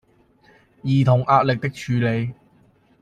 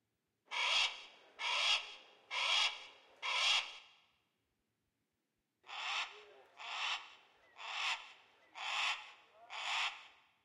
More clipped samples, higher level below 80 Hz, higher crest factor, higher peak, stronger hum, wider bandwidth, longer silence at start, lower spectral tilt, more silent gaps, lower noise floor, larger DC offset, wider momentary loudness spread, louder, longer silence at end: neither; first, -56 dBFS vs -90 dBFS; about the same, 20 dB vs 22 dB; first, -2 dBFS vs -20 dBFS; neither; second, 9.2 kHz vs 15.5 kHz; first, 0.85 s vs 0.5 s; first, -8 dB/octave vs 3.5 dB/octave; neither; second, -57 dBFS vs -87 dBFS; neither; second, 11 LU vs 23 LU; first, -20 LUFS vs -36 LUFS; first, 0.7 s vs 0.35 s